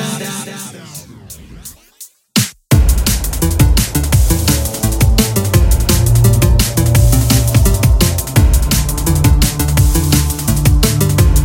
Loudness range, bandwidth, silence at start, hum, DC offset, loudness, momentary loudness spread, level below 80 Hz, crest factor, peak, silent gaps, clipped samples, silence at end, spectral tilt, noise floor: 4 LU; 17 kHz; 0 s; none; under 0.1%; -13 LUFS; 14 LU; -16 dBFS; 12 dB; 0 dBFS; none; under 0.1%; 0 s; -4.5 dB/octave; -39 dBFS